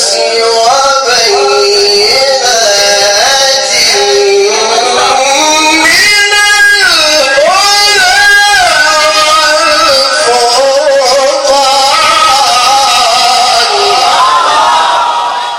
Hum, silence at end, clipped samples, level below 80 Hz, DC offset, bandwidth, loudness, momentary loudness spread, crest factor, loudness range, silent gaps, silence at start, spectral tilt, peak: none; 0 s; 1%; -42 dBFS; under 0.1%; over 20 kHz; -5 LUFS; 4 LU; 6 dB; 2 LU; none; 0 s; 0.5 dB/octave; 0 dBFS